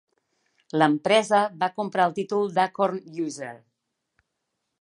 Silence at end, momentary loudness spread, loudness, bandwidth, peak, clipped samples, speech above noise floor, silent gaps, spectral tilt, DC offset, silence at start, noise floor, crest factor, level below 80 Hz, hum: 1.25 s; 12 LU; -24 LUFS; 11 kHz; -4 dBFS; under 0.1%; 56 dB; none; -5 dB/octave; under 0.1%; 0.75 s; -80 dBFS; 22 dB; -76 dBFS; none